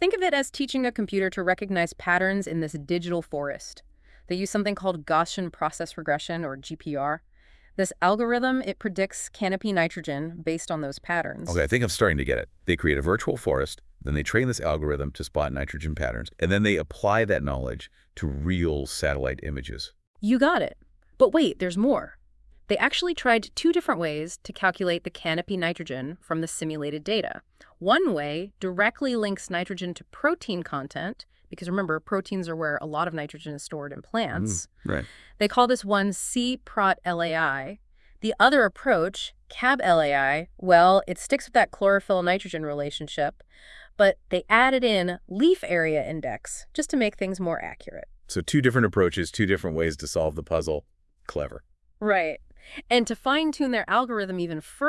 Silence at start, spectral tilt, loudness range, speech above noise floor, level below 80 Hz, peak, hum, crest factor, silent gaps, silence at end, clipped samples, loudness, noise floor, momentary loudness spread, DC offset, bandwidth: 0 s; -5 dB/octave; 6 LU; 30 dB; -46 dBFS; -2 dBFS; none; 22 dB; 20.07-20.14 s; 0 s; under 0.1%; -25 LUFS; -55 dBFS; 12 LU; under 0.1%; 12 kHz